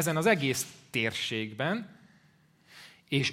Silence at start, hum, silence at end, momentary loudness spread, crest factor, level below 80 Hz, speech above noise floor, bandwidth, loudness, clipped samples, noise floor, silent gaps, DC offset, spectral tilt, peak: 0 s; none; 0 s; 25 LU; 22 dB; -70 dBFS; 34 dB; 16 kHz; -30 LUFS; under 0.1%; -64 dBFS; none; under 0.1%; -4 dB/octave; -10 dBFS